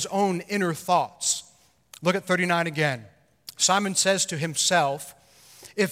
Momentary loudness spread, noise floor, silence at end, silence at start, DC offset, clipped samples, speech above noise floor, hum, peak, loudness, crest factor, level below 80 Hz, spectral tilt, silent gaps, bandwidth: 14 LU; -58 dBFS; 0 s; 0 s; under 0.1%; under 0.1%; 34 dB; none; -8 dBFS; -24 LUFS; 18 dB; -70 dBFS; -3 dB/octave; none; 16 kHz